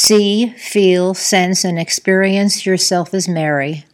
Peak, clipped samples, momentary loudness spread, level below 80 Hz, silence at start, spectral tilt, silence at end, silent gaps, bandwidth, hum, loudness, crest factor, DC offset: 0 dBFS; under 0.1%; 5 LU; -62 dBFS; 0 s; -3.5 dB/octave; 0.1 s; none; 16.5 kHz; none; -14 LUFS; 14 dB; under 0.1%